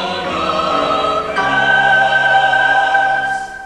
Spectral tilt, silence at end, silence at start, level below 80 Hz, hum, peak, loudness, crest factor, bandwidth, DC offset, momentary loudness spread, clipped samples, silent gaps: -3.5 dB/octave; 0 s; 0 s; -44 dBFS; none; -2 dBFS; -13 LUFS; 12 dB; 11.5 kHz; under 0.1%; 6 LU; under 0.1%; none